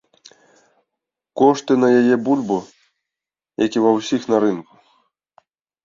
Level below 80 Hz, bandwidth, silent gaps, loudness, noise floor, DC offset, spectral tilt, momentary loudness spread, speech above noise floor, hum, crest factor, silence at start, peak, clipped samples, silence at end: -64 dBFS; 7.6 kHz; none; -17 LUFS; -88 dBFS; under 0.1%; -6 dB/octave; 11 LU; 71 dB; none; 18 dB; 1.35 s; -2 dBFS; under 0.1%; 1.25 s